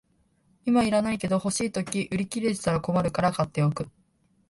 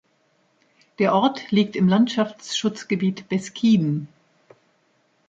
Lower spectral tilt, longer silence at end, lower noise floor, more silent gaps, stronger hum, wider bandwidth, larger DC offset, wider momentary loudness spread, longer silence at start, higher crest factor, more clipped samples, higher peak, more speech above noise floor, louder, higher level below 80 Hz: about the same, -5.5 dB/octave vs -6 dB/octave; second, 0.6 s vs 1.25 s; about the same, -66 dBFS vs -65 dBFS; neither; neither; first, 11.5 kHz vs 8 kHz; neither; about the same, 6 LU vs 8 LU; second, 0.65 s vs 1 s; about the same, 18 dB vs 16 dB; neither; about the same, -8 dBFS vs -6 dBFS; about the same, 41 dB vs 44 dB; second, -26 LUFS vs -22 LUFS; first, -54 dBFS vs -66 dBFS